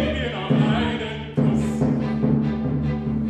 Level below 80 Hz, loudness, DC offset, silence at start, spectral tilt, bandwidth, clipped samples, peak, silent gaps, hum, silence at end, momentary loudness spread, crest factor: -38 dBFS; -22 LUFS; under 0.1%; 0 s; -7.5 dB/octave; 9.2 kHz; under 0.1%; -6 dBFS; none; none; 0 s; 5 LU; 16 dB